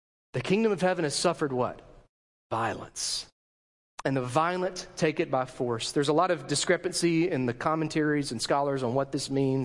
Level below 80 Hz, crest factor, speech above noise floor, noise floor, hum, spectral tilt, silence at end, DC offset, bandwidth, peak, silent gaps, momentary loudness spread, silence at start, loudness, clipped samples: -60 dBFS; 18 dB; over 62 dB; under -90 dBFS; none; -4.5 dB/octave; 0 s; under 0.1%; 11.5 kHz; -10 dBFS; 2.09-2.50 s, 3.32-3.98 s; 8 LU; 0.35 s; -28 LUFS; under 0.1%